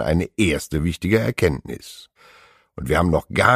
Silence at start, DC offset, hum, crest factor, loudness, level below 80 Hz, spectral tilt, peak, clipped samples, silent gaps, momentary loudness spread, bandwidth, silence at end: 0 s; under 0.1%; none; 20 dB; -21 LUFS; -36 dBFS; -6 dB/octave; 0 dBFS; under 0.1%; none; 18 LU; 15.5 kHz; 0 s